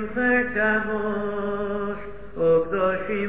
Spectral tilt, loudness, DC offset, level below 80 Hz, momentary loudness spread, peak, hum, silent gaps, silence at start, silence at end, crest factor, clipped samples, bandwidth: -10 dB/octave; -23 LUFS; 1%; -48 dBFS; 9 LU; -10 dBFS; none; none; 0 s; 0 s; 14 dB; under 0.1%; 4 kHz